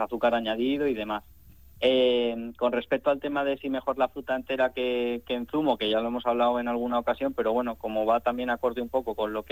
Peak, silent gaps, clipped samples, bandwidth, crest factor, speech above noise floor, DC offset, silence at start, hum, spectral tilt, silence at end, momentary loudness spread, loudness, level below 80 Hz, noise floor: -10 dBFS; none; under 0.1%; 15.5 kHz; 16 dB; 26 dB; 0.1%; 0 s; none; -6 dB/octave; 0.1 s; 5 LU; -27 LUFS; -56 dBFS; -52 dBFS